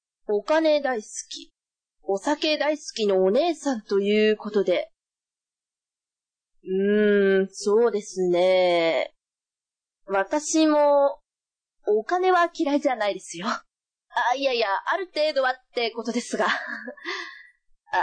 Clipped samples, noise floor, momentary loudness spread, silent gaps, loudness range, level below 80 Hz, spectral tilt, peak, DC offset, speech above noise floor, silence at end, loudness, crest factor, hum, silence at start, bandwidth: under 0.1%; under -90 dBFS; 12 LU; none; 3 LU; -70 dBFS; -4 dB/octave; -10 dBFS; under 0.1%; over 67 dB; 0 s; -23 LUFS; 14 dB; none; 0.3 s; 9.8 kHz